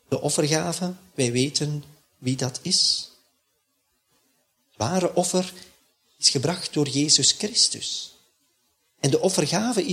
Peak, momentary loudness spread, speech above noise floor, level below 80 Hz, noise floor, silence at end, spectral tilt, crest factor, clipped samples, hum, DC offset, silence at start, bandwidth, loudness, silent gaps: -2 dBFS; 12 LU; 48 dB; -64 dBFS; -72 dBFS; 0 s; -3 dB/octave; 22 dB; under 0.1%; none; under 0.1%; 0.1 s; 16 kHz; -22 LUFS; none